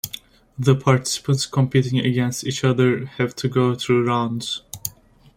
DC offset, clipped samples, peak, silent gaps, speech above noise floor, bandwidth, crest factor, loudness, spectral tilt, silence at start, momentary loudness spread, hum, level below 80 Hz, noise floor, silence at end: under 0.1%; under 0.1%; -2 dBFS; none; 26 dB; 16.5 kHz; 18 dB; -21 LUFS; -5.5 dB/octave; 0.05 s; 11 LU; none; -54 dBFS; -45 dBFS; 0.5 s